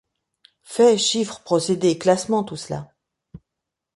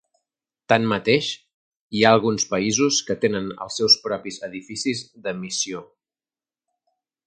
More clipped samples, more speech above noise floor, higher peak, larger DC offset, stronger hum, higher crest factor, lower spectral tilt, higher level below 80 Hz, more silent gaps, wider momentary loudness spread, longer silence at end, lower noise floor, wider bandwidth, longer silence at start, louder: neither; second, 64 dB vs over 68 dB; second, -4 dBFS vs 0 dBFS; neither; neither; about the same, 18 dB vs 22 dB; about the same, -4 dB/octave vs -3 dB/octave; about the same, -60 dBFS vs -60 dBFS; second, none vs 1.54-1.71 s, 1.81-1.90 s; about the same, 15 LU vs 14 LU; second, 0.6 s vs 1.4 s; second, -83 dBFS vs under -90 dBFS; about the same, 11.5 kHz vs 11 kHz; about the same, 0.7 s vs 0.7 s; about the same, -20 LUFS vs -21 LUFS